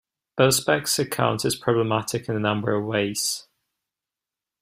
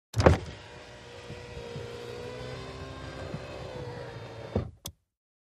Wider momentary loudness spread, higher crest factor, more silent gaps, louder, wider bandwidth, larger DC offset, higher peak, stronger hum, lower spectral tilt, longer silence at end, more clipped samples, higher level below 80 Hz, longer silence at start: second, 6 LU vs 18 LU; second, 20 dB vs 30 dB; neither; first, -23 LUFS vs -34 LUFS; first, 16 kHz vs 14.5 kHz; neither; about the same, -4 dBFS vs -4 dBFS; neither; second, -4 dB/octave vs -6 dB/octave; first, 1.2 s vs 0.55 s; neither; second, -60 dBFS vs -44 dBFS; first, 0.35 s vs 0.15 s